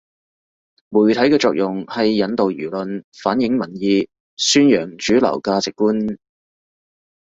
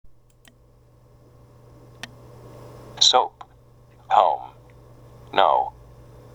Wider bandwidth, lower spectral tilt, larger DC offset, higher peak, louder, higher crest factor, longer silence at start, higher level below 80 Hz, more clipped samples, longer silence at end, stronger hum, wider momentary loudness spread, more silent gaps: second, 8 kHz vs 14 kHz; first, -4.5 dB/octave vs -1 dB/octave; neither; about the same, -2 dBFS vs -2 dBFS; about the same, -18 LUFS vs -20 LUFS; second, 16 dB vs 24 dB; first, 0.9 s vs 0.05 s; about the same, -56 dBFS vs -56 dBFS; neither; first, 1.05 s vs 0.65 s; neither; second, 11 LU vs 27 LU; first, 3.04-3.12 s, 4.20-4.37 s vs none